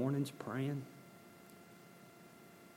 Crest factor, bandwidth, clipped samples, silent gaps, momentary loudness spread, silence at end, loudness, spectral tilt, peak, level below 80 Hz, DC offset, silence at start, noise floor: 18 dB; 16.5 kHz; under 0.1%; none; 19 LU; 0 s; -41 LUFS; -7 dB/octave; -26 dBFS; -86 dBFS; under 0.1%; 0 s; -59 dBFS